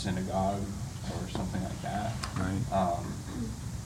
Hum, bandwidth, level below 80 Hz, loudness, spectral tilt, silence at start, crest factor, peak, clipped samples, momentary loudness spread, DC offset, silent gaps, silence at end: none; 16 kHz; -46 dBFS; -34 LUFS; -6 dB/octave; 0 s; 16 dB; -16 dBFS; under 0.1%; 8 LU; under 0.1%; none; 0 s